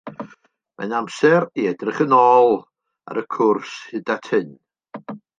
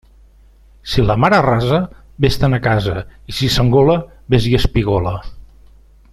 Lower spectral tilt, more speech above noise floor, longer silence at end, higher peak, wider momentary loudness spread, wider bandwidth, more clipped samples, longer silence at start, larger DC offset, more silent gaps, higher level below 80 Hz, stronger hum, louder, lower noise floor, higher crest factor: about the same, -6 dB/octave vs -6.5 dB/octave; first, 36 dB vs 32 dB; second, 0.25 s vs 0.7 s; about the same, -2 dBFS vs -2 dBFS; first, 22 LU vs 12 LU; second, 9.2 kHz vs 13.5 kHz; neither; second, 0.05 s vs 0.85 s; neither; neither; second, -72 dBFS vs -30 dBFS; neither; second, -19 LUFS vs -16 LUFS; first, -54 dBFS vs -46 dBFS; about the same, 18 dB vs 14 dB